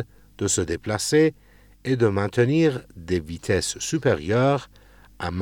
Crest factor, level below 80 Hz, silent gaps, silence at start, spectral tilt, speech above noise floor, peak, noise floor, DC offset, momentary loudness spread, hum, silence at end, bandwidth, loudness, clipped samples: 16 dB; -52 dBFS; none; 0 s; -5 dB/octave; 25 dB; -8 dBFS; -47 dBFS; under 0.1%; 11 LU; none; 0 s; 18 kHz; -23 LUFS; under 0.1%